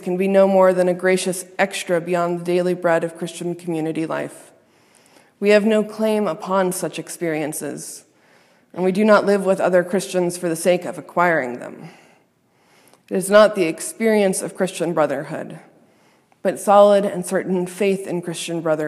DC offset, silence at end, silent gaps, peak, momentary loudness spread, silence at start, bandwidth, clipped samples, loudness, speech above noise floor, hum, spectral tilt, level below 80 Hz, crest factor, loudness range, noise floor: under 0.1%; 0 s; none; 0 dBFS; 13 LU; 0 s; 15 kHz; under 0.1%; -19 LUFS; 41 dB; none; -5 dB/octave; -72 dBFS; 20 dB; 4 LU; -60 dBFS